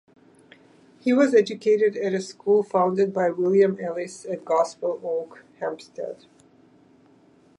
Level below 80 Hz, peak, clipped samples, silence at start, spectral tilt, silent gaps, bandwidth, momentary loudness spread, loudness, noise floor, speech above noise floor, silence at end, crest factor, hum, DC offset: -76 dBFS; -6 dBFS; under 0.1%; 1.05 s; -6 dB/octave; none; 11 kHz; 15 LU; -23 LUFS; -56 dBFS; 34 dB; 1.45 s; 18 dB; none; under 0.1%